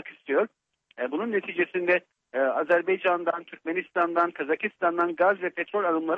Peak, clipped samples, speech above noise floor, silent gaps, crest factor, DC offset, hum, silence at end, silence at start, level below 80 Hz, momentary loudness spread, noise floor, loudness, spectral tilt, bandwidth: -10 dBFS; under 0.1%; 41 dB; none; 16 dB; under 0.1%; none; 0 s; 0.05 s; -76 dBFS; 8 LU; -67 dBFS; -26 LUFS; -7 dB/octave; 5.2 kHz